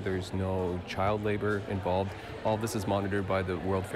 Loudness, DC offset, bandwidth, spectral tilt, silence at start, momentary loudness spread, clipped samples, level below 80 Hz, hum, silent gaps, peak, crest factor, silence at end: -31 LUFS; under 0.1%; 14.5 kHz; -6.5 dB/octave; 0 s; 3 LU; under 0.1%; -54 dBFS; none; none; -18 dBFS; 12 dB; 0 s